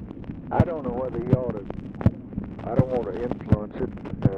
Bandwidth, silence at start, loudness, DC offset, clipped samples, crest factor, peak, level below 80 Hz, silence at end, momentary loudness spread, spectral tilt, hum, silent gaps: 5.6 kHz; 0 s; -27 LUFS; under 0.1%; under 0.1%; 18 dB; -6 dBFS; -40 dBFS; 0 s; 11 LU; -10.5 dB/octave; none; none